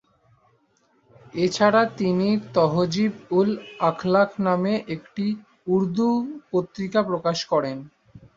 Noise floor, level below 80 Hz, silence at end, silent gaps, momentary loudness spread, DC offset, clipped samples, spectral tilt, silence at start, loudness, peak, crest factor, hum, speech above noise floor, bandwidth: -64 dBFS; -62 dBFS; 0.2 s; none; 8 LU; under 0.1%; under 0.1%; -6.5 dB/octave; 1.35 s; -23 LUFS; -4 dBFS; 20 dB; none; 42 dB; 7.8 kHz